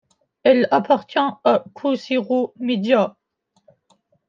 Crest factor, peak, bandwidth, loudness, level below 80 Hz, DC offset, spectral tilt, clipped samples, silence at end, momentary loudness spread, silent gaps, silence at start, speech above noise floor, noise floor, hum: 18 dB; -2 dBFS; 7.2 kHz; -19 LUFS; -74 dBFS; under 0.1%; -6.5 dB/octave; under 0.1%; 1.2 s; 6 LU; none; 0.45 s; 49 dB; -67 dBFS; none